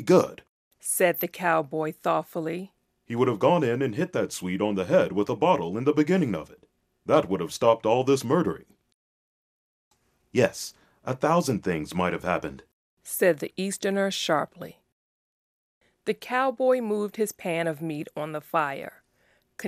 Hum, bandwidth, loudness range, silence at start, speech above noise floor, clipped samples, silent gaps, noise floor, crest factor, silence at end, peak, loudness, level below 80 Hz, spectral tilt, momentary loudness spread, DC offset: none; 15 kHz; 4 LU; 0 s; 42 dB; under 0.1%; 0.49-0.71 s, 8.94-9.91 s, 12.73-12.97 s, 14.92-15.81 s; -67 dBFS; 20 dB; 0 s; -6 dBFS; -26 LUFS; -64 dBFS; -5 dB/octave; 12 LU; under 0.1%